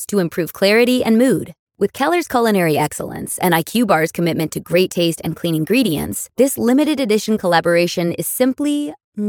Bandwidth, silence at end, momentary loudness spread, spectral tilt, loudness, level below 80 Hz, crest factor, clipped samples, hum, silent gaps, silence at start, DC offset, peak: 19 kHz; 0 s; 8 LU; -5 dB/octave; -17 LUFS; -52 dBFS; 16 dB; under 0.1%; none; 1.59-1.67 s, 9.04-9.12 s; 0 s; under 0.1%; 0 dBFS